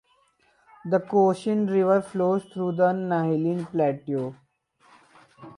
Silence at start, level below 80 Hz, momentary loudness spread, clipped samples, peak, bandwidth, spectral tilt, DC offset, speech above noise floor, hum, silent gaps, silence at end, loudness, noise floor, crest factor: 0.85 s; -72 dBFS; 8 LU; under 0.1%; -8 dBFS; 11 kHz; -8.5 dB/octave; under 0.1%; 41 dB; none; none; 0.05 s; -24 LUFS; -64 dBFS; 16 dB